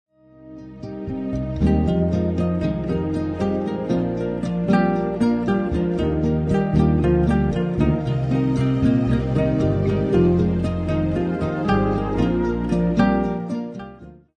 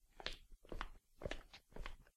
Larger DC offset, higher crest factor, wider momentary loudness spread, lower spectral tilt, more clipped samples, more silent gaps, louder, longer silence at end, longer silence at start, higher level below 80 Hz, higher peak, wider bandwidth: neither; second, 16 dB vs 30 dB; about the same, 8 LU vs 8 LU; first, -9 dB/octave vs -4 dB/octave; neither; neither; first, -21 LUFS vs -53 LUFS; first, 0.25 s vs 0.05 s; first, 0.4 s vs 0.05 s; first, -32 dBFS vs -54 dBFS; first, -4 dBFS vs -20 dBFS; second, 9.4 kHz vs 14.5 kHz